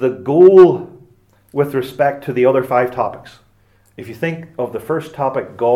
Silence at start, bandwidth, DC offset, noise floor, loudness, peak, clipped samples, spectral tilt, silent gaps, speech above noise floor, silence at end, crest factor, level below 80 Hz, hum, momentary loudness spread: 0 s; 13.5 kHz; under 0.1%; -54 dBFS; -15 LUFS; 0 dBFS; 0.1%; -8 dB/octave; none; 40 dB; 0 s; 16 dB; -58 dBFS; none; 16 LU